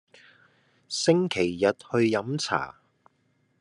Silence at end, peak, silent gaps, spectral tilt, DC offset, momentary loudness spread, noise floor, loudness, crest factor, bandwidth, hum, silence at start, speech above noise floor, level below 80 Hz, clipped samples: 0.9 s; -8 dBFS; none; -5 dB/octave; under 0.1%; 7 LU; -69 dBFS; -26 LUFS; 20 dB; 11.5 kHz; none; 0.9 s; 44 dB; -70 dBFS; under 0.1%